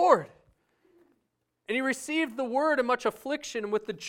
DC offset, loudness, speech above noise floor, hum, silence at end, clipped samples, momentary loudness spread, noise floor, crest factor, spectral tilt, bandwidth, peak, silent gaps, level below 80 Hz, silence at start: under 0.1%; -28 LUFS; 49 dB; none; 0 s; under 0.1%; 8 LU; -78 dBFS; 24 dB; -3.5 dB/octave; 17 kHz; -6 dBFS; none; -72 dBFS; 0 s